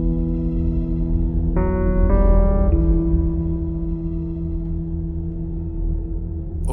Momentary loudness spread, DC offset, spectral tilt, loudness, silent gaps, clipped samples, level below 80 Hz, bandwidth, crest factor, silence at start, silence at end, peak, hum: 10 LU; under 0.1%; -11 dB/octave; -22 LUFS; none; under 0.1%; -20 dBFS; 2.6 kHz; 14 dB; 0 s; 0 s; -4 dBFS; none